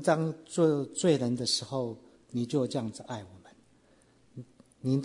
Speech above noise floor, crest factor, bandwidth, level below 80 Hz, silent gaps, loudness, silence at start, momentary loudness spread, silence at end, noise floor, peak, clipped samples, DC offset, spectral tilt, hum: 34 dB; 20 dB; 11 kHz; -72 dBFS; none; -30 LUFS; 0 s; 22 LU; 0 s; -63 dBFS; -10 dBFS; under 0.1%; under 0.1%; -5.5 dB/octave; none